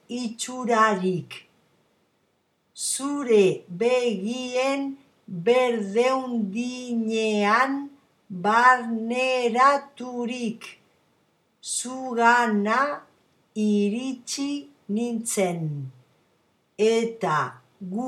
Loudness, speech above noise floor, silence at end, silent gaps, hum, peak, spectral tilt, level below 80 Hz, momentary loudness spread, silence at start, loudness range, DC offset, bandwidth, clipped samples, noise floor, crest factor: -24 LUFS; 46 dB; 0 s; none; none; -4 dBFS; -4 dB/octave; -82 dBFS; 15 LU; 0.1 s; 5 LU; under 0.1%; 15 kHz; under 0.1%; -70 dBFS; 20 dB